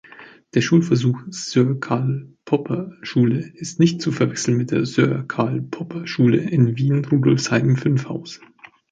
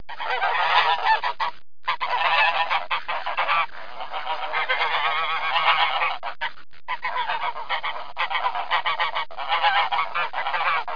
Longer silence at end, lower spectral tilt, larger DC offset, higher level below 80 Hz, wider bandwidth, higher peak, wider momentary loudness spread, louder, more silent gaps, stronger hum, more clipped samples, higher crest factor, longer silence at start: first, 0.55 s vs 0 s; first, -6.5 dB/octave vs -2 dB/octave; second, under 0.1% vs 3%; first, -58 dBFS vs -66 dBFS; first, 9 kHz vs 5.2 kHz; first, -2 dBFS vs -6 dBFS; about the same, 10 LU vs 10 LU; first, -20 LUFS vs -23 LUFS; neither; neither; neither; about the same, 16 dB vs 18 dB; about the same, 0.2 s vs 0.1 s